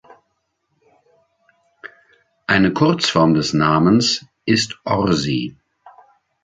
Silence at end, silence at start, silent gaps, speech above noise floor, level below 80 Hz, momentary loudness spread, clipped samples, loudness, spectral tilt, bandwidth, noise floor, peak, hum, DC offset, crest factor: 0.95 s; 1.85 s; none; 54 dB; -48 dBFS; 8 LU; under 0.1%; -17 LUFS; -5 dB/octave; 9.4 kHz; -71 dBFS; -2 dBFS; none; under 0.1%; 18 dB